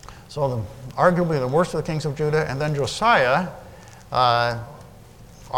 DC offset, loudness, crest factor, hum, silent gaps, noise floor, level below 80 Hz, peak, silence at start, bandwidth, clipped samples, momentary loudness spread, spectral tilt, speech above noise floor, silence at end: 0.1%; -21 LUFS; 20 dB; none; none; -45 dBFS; -48 dBFS; -2 dBFS; 0.05 s; 17 kHz; under 0.1%; 15 LU; -5.5 dB/octave; 24 dB; 0 s